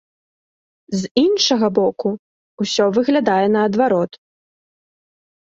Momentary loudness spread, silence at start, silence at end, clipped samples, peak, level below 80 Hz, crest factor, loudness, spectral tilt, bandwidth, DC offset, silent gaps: 11 LU; 0.9 s; 1.45 s; under 0.1%; -2 dBFS; -60 dBFS; 18 dB; -17 LUFS; -4.5 dB/octave; 8 kHz; under 0.1%; 1.11-1.15 s, 2.19-2.58 s